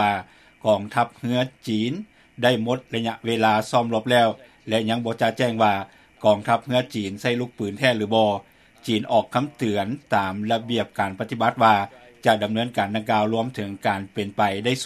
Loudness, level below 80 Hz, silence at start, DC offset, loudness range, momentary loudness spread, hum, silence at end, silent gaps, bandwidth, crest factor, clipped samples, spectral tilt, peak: -23 LUFS; -64 dBFS; 0 s; under 0.1%; 2 LU; 8 LU; none; 0 s; none; 14.5 kHz; 20 dB; under 0.1%; -5.5 dB/octave; -2 dBFS